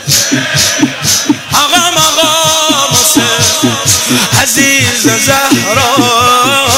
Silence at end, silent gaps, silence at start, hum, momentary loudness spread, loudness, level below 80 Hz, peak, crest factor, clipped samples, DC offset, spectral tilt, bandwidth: 0 s; none; 0 s; none; 3 LU; -7 LUFS; -42 dBFS; 0 dBFS; 8 dB; 0.3%; under 0.1%; -2 dB/octave; 16.5 kHz